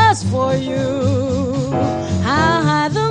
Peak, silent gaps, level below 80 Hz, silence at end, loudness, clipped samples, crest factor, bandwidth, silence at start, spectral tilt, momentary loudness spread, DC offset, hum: -2 dBFS; none; -40 dBFS; 0 s; -17 LUFS; under 0.1%; 14 dB; 10.5 kHz; 0 s; -6 dB/octave; 5 LU; under 0.1%; none